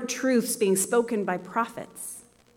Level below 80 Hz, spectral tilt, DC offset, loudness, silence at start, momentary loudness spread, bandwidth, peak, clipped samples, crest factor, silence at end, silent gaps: -72 dBFS; -4 dB/octave; under 0.1%; -26 LUFS; 0 s; 14 LU; 18 kHz; -12 dBFS; under 0.1%; 16 dB; 0.35 s; none